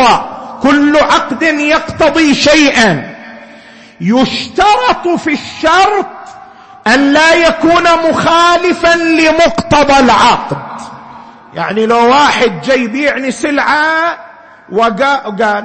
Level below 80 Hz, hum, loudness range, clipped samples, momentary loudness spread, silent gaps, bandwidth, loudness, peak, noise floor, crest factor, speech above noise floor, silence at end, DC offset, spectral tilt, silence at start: -38 dBFS; none; 4 LU; under 0.1%; 12 LU; none; 8.8 kHz; -9 LUFS; 0 dBFS; -36 dBFS; 10 dB; 27 dB; 0 s; under 0.1%; -4 dB/octave; 0 s